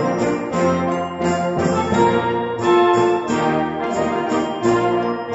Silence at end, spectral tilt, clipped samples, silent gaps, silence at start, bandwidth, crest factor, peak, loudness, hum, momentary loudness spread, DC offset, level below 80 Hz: 0 s; -6 dB/octave; under 0.1%; none; 0 s; 8 kHz; 16 dB; -4 dBFS; -18 LUFS; none; 6 LU; under 0.1%; -48 dBFS